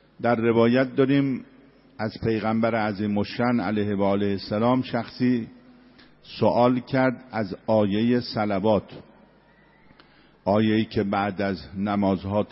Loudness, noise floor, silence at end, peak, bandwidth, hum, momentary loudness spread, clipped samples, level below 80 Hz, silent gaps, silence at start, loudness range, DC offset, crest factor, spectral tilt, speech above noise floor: -24 LUFS; -56 dBFS; 0.05 s; -6 dBFS; 5.8 kHz; none; 9 LU; under 0.1%; -56 dBFS; none; 0.2 s; 3 LU; under 0.1%; 18 dB; -11 dB/octave; 33 dB